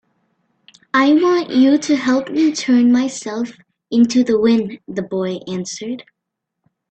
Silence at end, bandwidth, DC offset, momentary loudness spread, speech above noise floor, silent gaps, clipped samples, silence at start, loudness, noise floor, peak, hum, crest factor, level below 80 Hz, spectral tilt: 0.9 s; 8.8 kHz; under 0.1%; 12 LU; 63 dB; none; under 0.1%; 0.95 s; -16 LUFS; -79 dBFS; -2 dBFS; none; 16 dB; -60 dBFS; -4.5 dB/octave